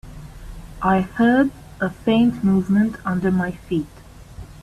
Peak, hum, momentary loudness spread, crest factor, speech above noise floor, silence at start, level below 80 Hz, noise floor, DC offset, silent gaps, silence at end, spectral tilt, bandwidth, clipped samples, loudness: -6 dBFS; none; 23 LU; 14 dB; 20 dB; 0.05 s; -42 dBFS; -39 dBFS; under 0.1%; none; 0.1 s; -8 dB/octave; 13 kHz; under 0.1%; -20 LUFS